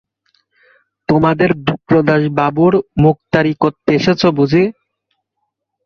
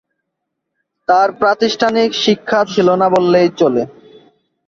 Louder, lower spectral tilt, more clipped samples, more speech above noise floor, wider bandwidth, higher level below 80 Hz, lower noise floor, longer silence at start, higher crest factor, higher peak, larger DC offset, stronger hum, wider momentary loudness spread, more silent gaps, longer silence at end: about the same, -14 LUFS vs -13 LUFS; first, -7.5 dB/octave vs -5 dB/octave; neither; about the same, 60 dB vs 63 dB; second, 6.8 kHz vs 7.6 kHz; first, -46 dBFS vs -58 dBFS; about the same, -73 dBFS vs -75 dBFS; about the same, 1.1 s vs 1.1 s; about the same, 14 dB vs 14 dB; about the same, 0 dBFS vs 0 dBFS; neither; neither; about the same, 5 LU vs 4 LU; neither; first, 1.15 s vs 0.8 s